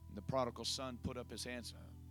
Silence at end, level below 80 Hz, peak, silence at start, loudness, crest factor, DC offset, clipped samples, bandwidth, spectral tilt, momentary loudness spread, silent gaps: 0 s; -60 dBFS; -24 dBFS; 0 s; -43 LUFS; 20 dB; under 0.1%; under 0.1%; 19 kHz; -4 dB/octave; 10 LU; none